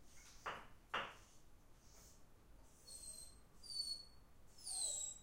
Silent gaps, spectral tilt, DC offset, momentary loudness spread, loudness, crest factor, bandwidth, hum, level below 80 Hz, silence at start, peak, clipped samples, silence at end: none; 0.5 dB/octave; under 0.1%; 26 LU; -47 LUFS; 24 dB; 16 kHz; none; -68 dBFS; 0 s; -28 dBFS; under 0.1%; 0 s